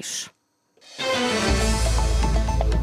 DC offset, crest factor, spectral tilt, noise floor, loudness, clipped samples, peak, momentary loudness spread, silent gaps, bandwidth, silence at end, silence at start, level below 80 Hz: under 0.1%; 14 dB; -4 dB/octave; -60 dBFS; -23 LUFS; under 0.1%; -8 dBFS; 10 LU; none; 14.5 kHz; 0 s; 0 s; -24 dBFS